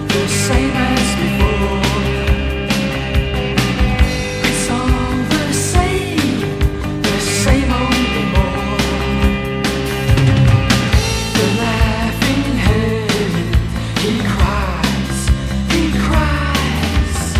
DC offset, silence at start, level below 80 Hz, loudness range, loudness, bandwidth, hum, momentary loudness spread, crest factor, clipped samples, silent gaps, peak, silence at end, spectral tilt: under 0.1%; 0 s; -20 dBFS; 2 LU; -16 LUFS; 15.5 kHz; none; 4 LU; 14 dB; under 0.1%; none; 0 dBFS; 0 s; -5 dB/octave